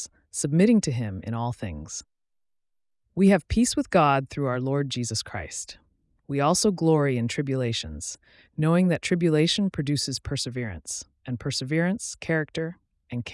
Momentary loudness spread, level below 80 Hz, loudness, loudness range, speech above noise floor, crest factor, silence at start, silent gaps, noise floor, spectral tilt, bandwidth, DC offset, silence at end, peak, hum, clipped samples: 14 LU; -50 dBFS; -25 LUFS; 3 LU; 52 dB; 16 dB; 0 s; none; -76 dBFS; -5 dB/octave; 12 kHz; under 0.1%; 0 s; -8 dBFS; none; under 0.1%